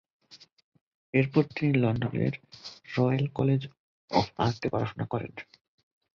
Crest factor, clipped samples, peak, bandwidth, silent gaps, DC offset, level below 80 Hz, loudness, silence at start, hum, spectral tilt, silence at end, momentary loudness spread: 22 dB; under 0.1%; -8 dBFS; 7 kHz; 0.53-0.57 s, 0.63-0.72 s, 0.81-1.13 s, 3.79-4.08 s; under 0.1%; -58 dBFS; -28 LUFS; 0.3 s; none; -8 dB/octave; 0.7 s; 16 LU